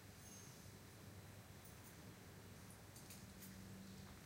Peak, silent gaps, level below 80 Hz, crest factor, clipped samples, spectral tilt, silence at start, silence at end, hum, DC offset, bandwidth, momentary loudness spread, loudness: -42 dBFS; none; -72 dBFS; 16 dB; under 0.1%; -4 dB/octave; 0 s; 0 s; none; under 0.1%; 16 kHz; 2 LU; -58 LUFS